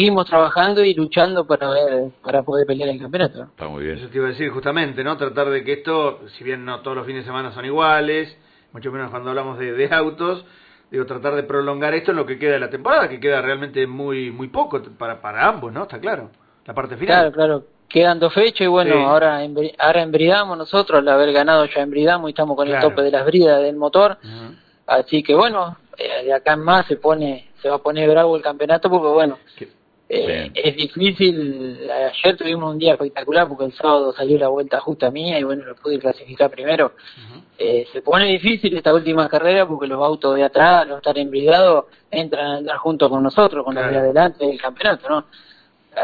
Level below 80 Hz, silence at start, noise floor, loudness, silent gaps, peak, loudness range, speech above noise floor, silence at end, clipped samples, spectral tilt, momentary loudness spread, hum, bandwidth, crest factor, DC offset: -56 dBFS; 0 s; -40 dBFS; -18 LUFS; none; 0 dBFS; 7 LU; 23 dB; 0 s; under 0.1%; -8 dB/octave; 12 LU; none; 4.9 kHz; 16 dB; under 0.1%